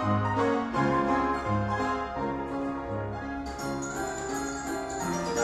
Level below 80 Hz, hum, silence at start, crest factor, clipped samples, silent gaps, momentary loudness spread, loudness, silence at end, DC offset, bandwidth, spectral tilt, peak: -48 dBFS; none; 0 s; 16 dB; under 0.1%; none; 8 LU; -30 LUFS; 0 s; under 0.1%; 14 kHz; -5.5 dB/octave; -12 dBFS